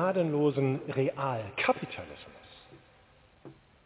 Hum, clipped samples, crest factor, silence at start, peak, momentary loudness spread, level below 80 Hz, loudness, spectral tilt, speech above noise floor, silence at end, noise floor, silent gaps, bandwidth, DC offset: none; under 0.1%; 18 dB; 0 s; -14 dBFS; 22 LU; -66 dBFS; -30 LUFS; -5.5 dB/octave; 30 dB; 0.35 s; -61 dBFS; none; 4 kHz; under 0.1%